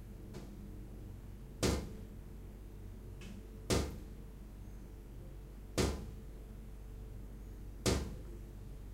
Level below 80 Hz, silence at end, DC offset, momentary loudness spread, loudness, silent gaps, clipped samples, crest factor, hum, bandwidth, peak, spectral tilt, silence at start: -48 dBFS; 0 s; under 0.1%; 16 LU; -43 LUFS; none; under 0.1%; 22 dB; none; 16 kHz; -20 dBFS; -4.5 dB/octave; 0 s